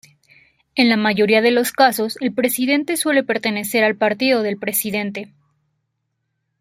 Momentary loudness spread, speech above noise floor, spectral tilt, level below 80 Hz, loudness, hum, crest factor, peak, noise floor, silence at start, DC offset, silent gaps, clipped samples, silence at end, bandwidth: 7 LU; 56 dB; -3.5 dB/octave; -64 dBFS; -18 LUFS; none; 18 dB; -2 dBFS; -74 dBFS; 0.75 s; under 0.1%; none; under 0.1%; 1.35 s; 16.5 kHz